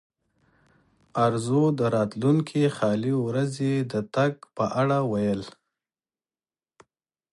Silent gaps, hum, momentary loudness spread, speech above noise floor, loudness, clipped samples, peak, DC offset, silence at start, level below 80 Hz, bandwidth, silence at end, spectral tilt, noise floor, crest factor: none; none; 5 LU; over 66 dB; -25 LUFS; under 0.1%; -8 dBFS; under 0.1%; 1.15 s; -64 dBFS; 11.5 kHz; 1.8 s; -7.5 dB/octave; under -90 dBFS; 18 dB